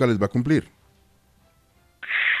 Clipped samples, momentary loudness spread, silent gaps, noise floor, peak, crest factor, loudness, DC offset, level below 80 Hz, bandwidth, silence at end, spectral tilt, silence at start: under 0.1%; 7 LU; none; -60 dBFS; -8 dBFS; 18 dB; -23 LUFS; under 0.1%; -54 dBFS; 13 kHz; 0 s; -6.5 dB/octave; 0 s